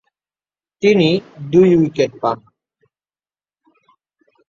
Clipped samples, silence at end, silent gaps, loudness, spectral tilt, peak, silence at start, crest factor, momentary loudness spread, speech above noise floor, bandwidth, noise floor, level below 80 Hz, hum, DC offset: under 0.1%; 2.15 s; none; -15 LUFS; -7 dB/octave; -2 dBFS; 0.8 s; 18 dB; 10 LU; over 76 dB; 7.2 kHz; under -90 dBFS; -56 dBFS; 50 Hz at -50 dBFS; under 0.1%